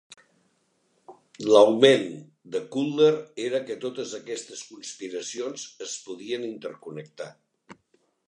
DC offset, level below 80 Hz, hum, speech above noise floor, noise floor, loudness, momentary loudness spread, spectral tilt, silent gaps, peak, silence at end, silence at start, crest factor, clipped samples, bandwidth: under 0.1%; -80 dBFS; none; 45 dB; -70 dBFS; -25 LUFS; 22 LU; -4 dB/octave; none; -2 dBFS; 0.55 s; 1.1 s; 24 dB; under 0.1%; 10.5 kHz